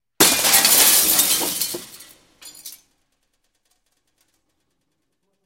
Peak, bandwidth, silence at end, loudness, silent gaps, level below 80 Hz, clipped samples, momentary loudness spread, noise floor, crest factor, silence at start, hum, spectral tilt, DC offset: 0 dBFS; 17 kHz; 2.7 s; -14 LUFS; none; -58 dBFS; under 0.1%; 22 LU; -74 dBFS; 22 dB; 0.2 s; none; 0.5 dB/octave; under 0.1%